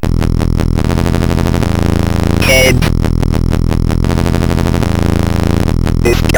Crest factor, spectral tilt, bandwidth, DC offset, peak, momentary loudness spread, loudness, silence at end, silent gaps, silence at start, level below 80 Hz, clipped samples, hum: 10 dB; -6 dB/octave; over 20 kHz; under 0.1%; 0 dBFS; 5 LU; -12 LUFS; 0 s; none; 0 s; -16 dBFS; 0.5%; none